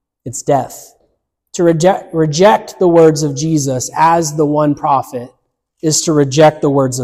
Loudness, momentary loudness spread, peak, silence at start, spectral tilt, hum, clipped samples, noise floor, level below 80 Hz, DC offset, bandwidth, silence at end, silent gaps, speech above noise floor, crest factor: -12 LUFS; 12 LU; 0 dBFS; 0.25 s; -5 dB/octave; none; under 0.1%; -63 dBFS; -50 dBFS; under 0.1%; 15.5 kHz; 0 s; none; 51 dB; 12 dB